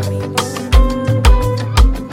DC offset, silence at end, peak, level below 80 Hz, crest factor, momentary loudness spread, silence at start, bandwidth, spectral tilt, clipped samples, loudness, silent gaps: under 0.1%; 0 s; 0 dBFS; -14 dBFS; 12 dB; 6 LU; 0 s; 16 kHz; -5.5 dB/octave; under 0.1%; -15 LUFS; none